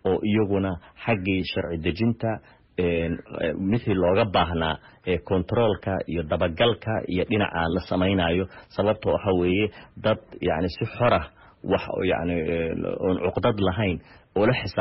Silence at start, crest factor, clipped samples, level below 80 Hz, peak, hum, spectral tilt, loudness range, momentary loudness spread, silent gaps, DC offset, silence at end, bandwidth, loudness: 0.05 s; 16 dB; under 0.1%; -46 dBFS; -10 dBFS; none; -5 dB/octave; 2 LU; 7 LU; none; under 0.1%; 0 s; 5.8 kHz; -25 LUFS